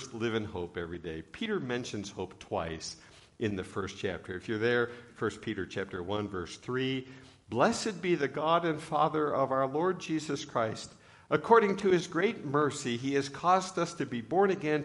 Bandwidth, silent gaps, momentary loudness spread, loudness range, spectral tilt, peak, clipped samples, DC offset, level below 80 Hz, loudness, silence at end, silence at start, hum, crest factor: 11.5 kHz; none; 11 LU; 8 LU; -5 dB/octave; -8 dBFS; under 0.1%; under 0.1%; -64 dBFS; -31 LUFS; 0 s; 0 s; none; 22 dB